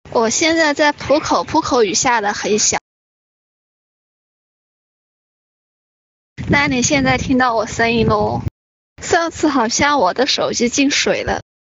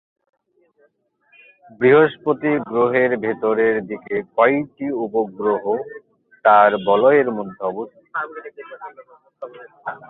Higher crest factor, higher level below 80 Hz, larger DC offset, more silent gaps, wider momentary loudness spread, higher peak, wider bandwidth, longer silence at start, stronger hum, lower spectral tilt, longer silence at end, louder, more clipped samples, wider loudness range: about the same, 16 dB vs 18 dB; first, -42 dBFS vs -64 dBFS; neither; first, 2.81-6.36 s, 8.51-8.96 s vs none; second, 5 LU vs 23 LU; about the same, -2 dBFS vs -2 dBFS; first, 8.2 kHz vs 4.1 kHz; second, 0.05 s vs 1.8 s; neither; second, -3 dB/octave vs -10.5 dB/octave; first, 0.2 s vs 0.05 s; first, -15 LUFS vs -18 LUFS; neither; first, 7 LU vs 3 LU